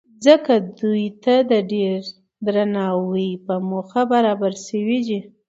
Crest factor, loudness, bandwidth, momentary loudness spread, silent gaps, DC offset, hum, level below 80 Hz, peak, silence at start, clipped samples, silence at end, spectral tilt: 18 dB; -20 LUFS; 8 kHz; 10 LU; none; under 0.1%; none; -70 dBFS; 0 dBFS; 0.2 s; under 0.1%; 0.2 s; -6 dB/octave